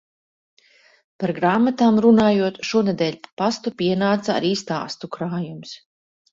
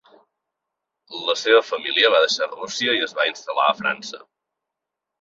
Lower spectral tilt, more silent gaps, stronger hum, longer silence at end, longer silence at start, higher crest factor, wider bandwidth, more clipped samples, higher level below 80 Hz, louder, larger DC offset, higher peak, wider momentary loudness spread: first, -6 dB/octave vs -1.5 dB/octave; first, 3.32-3.37 s vs none; neither; second, 0.55 s vs 1.05 s; about the same, 1.2 s vs 1.1 s; about the same, 18 dB vs 20 dB; about the same, 7.6 kHz vs 7.8 kHz; neither; first, -60 dBFS vs -72 dBFS; about the same, -20 LUFS vs -20 LUFS; neither; about the same, -4 dBFS vs -2 dBFS; about the same, 14 LU vs 14 LU